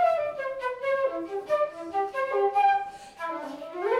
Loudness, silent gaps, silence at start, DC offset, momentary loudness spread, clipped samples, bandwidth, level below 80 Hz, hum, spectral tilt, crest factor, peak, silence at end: -28 LUFS; none; 0 s; under 0.1%; 12 LU; under 0.1%; 12.5 kHz; -68 dBFS; none; -4 dB/octave; 14 dB; -14 dBFS; 0 s